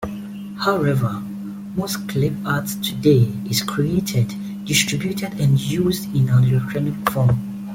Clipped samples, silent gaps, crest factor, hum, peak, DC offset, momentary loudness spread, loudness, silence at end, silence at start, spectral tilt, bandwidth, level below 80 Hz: under 0.1%; none; 18 dB; none; -2 dBFS; under 0.1%; 11 LU; -20 LUFS; 0 s; 0 s; -5.5 dB/octave; 17 kHz; -48 dBFS